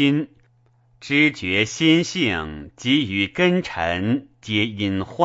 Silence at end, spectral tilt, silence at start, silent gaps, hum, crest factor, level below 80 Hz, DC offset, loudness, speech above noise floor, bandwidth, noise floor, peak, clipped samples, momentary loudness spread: 0 s; -5 dB/octave; 0 s; none; none; 20 dB; -50 dBFS; under 0.1%; -20 LUFS; 38 dB; 8 kHz; -59 dBFS; -2 dBFS; under 0.1%; 9 LU